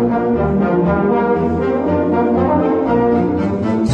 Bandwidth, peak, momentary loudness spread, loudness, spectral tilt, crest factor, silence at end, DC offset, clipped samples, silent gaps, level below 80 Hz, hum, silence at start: 7.6 kHz; -2 dBFS; 3 LU; -15 LUFS; -9 dB/octave; 12 dB; 0 s; under 0.1%; under 0.1%; none; -36 dBFS; none; 0 s